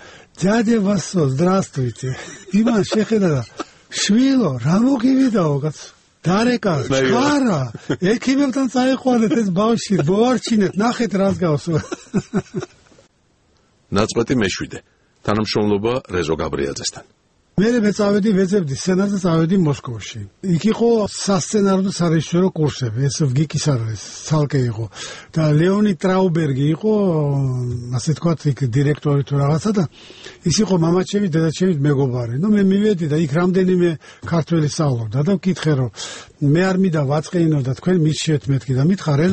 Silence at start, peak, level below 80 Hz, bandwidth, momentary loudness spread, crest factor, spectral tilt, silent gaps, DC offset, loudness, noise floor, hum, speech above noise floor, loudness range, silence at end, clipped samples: 0 s; 0 dBFS; -48 dBFS; 8.8 kHz; 9 LU; 16 dB; -6 dB/octave; none; under 0.1%; -18 LUFS; -59 dBFS; none; 42 dB; 4 LU; 0 s; under 0.1%